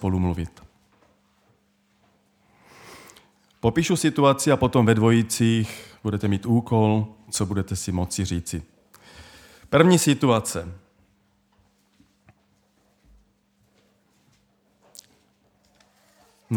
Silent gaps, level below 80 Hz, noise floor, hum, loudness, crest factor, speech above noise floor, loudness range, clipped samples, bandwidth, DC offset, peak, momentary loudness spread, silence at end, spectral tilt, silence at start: none; -50 dBFS; -65 dBFS; none; -22 LUFS; 22 dB; 44 dB; 10 LU; under 0.1%; 18 kHz; under 0.1%; -2 dBFS; 14 LU; 0 s; -5.5 dB/octave; 0 s